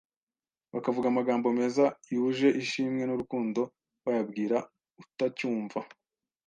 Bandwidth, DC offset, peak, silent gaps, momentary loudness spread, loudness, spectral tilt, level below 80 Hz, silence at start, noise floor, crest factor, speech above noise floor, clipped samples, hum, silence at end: 9.2 kHz; under 0.1%; -12 dBFS; none; 12 LU; -30 LUFS; -6 dB/octave; -74 dBFS; 0.75 s; under -90 dBFS; 18 dB; over 61 dB; under 0.1%; none; 0.6 s